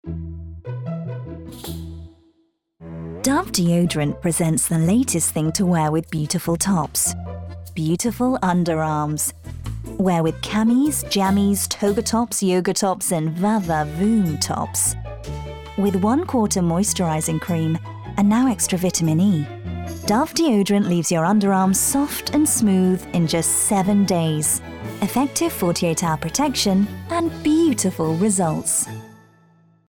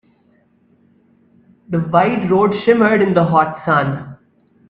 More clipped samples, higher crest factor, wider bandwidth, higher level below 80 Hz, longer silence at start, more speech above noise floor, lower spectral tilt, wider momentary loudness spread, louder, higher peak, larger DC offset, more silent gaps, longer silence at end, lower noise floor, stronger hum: neither; about the same, 14 dB vs 16 dB; first, 19.5 kHz vs 5 kHz; first, -44 dBFS vs -54 dBFS; second, 0.05 s vs 1.7 s; about the same, 45 dB vs 42 dB; second, -5 dB/octave vs -9.5 dB/octave; first, 14 LU vs 10 LU; second, -20 LUFS vs -15 LUFS; second, -6 dBFS vs 0 dBFS; neither; neither; first, 0.75 s vs 0.55 s; first, -64 dBFS vs -56 dBFS; neither